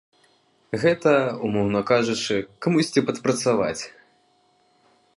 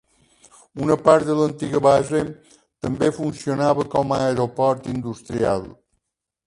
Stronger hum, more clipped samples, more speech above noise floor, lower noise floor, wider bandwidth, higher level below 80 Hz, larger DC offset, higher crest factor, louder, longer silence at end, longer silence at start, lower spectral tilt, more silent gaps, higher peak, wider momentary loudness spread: neither; neither; second, 41 dB vs 60 dB; second, -63 dBFS vs -80 dBFS; about the same, 11.5 kHz vs 11.5 kHz; second, -60 dBFS vs -52 dBFS; neither; about the same, 18 dB vs 20 dB; about the same, -22 LUFS vs -21 LUFS; first, 1.25 s vs 0.75 s; about the same, 0.7 s vs 0.75 s; second, -5 dB/octave vs -6.5 dB/octave; neither; second, -6 dBFS vs 0 dBFS; second, 7 LU vs 12 LU